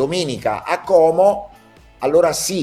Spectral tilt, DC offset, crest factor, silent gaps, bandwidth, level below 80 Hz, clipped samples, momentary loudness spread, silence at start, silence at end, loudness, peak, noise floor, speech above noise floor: -4 dB/octave; under 0.1%; 16 dB; none; 15.5 kHz; -50 dBFS; under 0.1%; 9 LU; 0 s; 0 s; -17 LUFS; -2 dBFS; -46 dBFS; 30 dB